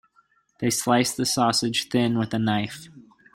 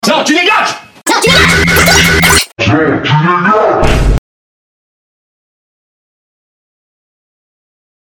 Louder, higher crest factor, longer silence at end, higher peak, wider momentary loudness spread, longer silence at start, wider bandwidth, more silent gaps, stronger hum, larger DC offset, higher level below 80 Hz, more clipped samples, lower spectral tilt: second, -23 LUFS vs -8 LUFS; first, 20 dB vs 12 dB; second, 0.35 s vs 3.95 s; second, -6 dBFS vs 0 dBFS; about the same, 7 LU vs 8 LU; first, 0.6 s vs 0.05 s; second, 16.5 kHz vs over 20 kHz; neither; neither; neither; second, -60 dBFS vs -22 dBFS; second, under 0.1% vs 0.6%; about the same, -4 dB/octave vs -3.5 dB/octave